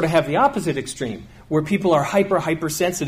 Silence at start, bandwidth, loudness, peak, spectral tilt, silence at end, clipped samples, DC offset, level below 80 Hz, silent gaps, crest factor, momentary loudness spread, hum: 0 s; 15.5 kHz; -20 LUFS; -4 dBFS; -5 dB/octave; 0 s; under 0.1%; under 0.1%; -48 dBFS; none; 16 dB; 10 LU; none